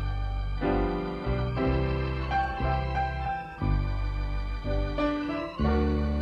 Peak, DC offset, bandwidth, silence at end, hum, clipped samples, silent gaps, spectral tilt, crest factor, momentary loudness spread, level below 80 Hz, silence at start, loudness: -14 dBFS; under 0.1%; 6.4 kHz; 0 s; none; under 0.1%; none; -8.5 dB/octave; 14 dB; 6 LU; -32 dBFS; 0 s; -30 LUFS